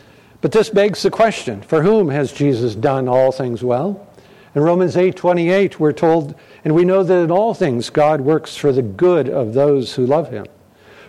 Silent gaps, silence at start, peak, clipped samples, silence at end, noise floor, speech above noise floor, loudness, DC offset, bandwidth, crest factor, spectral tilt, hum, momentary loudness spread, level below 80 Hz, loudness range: none; 0.45 s; -4 dBFS; under 0.1%; 0.65 s; -45 dBFS; 30 dB; -16 LUFS; under 0.1%; 12.5 kHz; 12 dB; -7 dB/octave; none; 6 LU; -54 dBFS; 2 LU